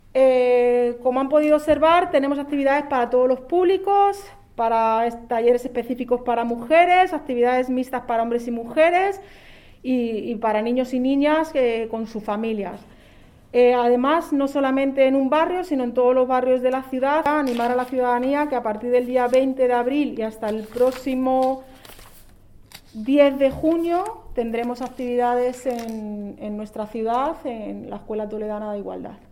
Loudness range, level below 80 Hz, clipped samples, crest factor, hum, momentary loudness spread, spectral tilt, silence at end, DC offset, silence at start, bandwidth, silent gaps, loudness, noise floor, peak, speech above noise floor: 6 LU; -50 dBFS; under 0.1%; 18 dB; none; 12 LU; -5.5 dB/octave; 0.15 s; under 0.1%; 0.15 s; 15.5 kHz; none; -21 LUFS; -49 dBFS; -4 dBFS; 28 dB